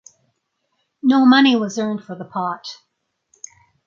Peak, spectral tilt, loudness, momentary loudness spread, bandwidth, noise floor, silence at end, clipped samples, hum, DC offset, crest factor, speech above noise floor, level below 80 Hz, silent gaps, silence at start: -2 dBFS; -4.5 dB/octave; -17 LUFS; 27 LU; 7.4 kHz; -71 dBFS; 1.1 s; under 0.1%; none; under 0.1%; 18 dB; 55 dB; -72 dBFS; none; 1.05 s